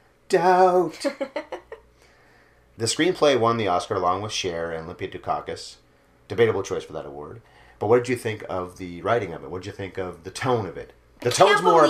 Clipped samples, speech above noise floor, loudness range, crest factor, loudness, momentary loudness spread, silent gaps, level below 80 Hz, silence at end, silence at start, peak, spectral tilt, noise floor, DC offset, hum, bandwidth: under 0.1%; 33 dB; 5 LU; 22 dB; -23 LUFS; 17 LU; none; -58 dBFS; 0 s; 0.3 s; -2 dBFS; -4.5 dB/octave; -56 dBFS; under 0.1%; none; 15.5 kHz